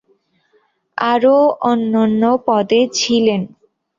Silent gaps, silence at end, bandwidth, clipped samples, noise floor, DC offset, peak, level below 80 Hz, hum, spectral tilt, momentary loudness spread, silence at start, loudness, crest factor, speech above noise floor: none; 0.5 s; 7.6 kHz; under 0.1%; -60 dBFS; under 0.1%; -2 dBFS; -60 dBFS; none; -4.5 dB/octave; 9 LU; 0.95 s; -15 LUFS; 14 dB; 46 dB